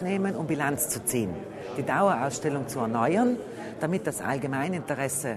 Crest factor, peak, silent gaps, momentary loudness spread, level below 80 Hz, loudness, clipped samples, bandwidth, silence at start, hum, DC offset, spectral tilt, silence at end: 18 dB; -10 dBFS; none; 9 LU; -62 dBFS; -28 LUFS; under 0.1%; 13.5 kHz; 0 s; none; under 0.1%; -5 dB/octave; 0 s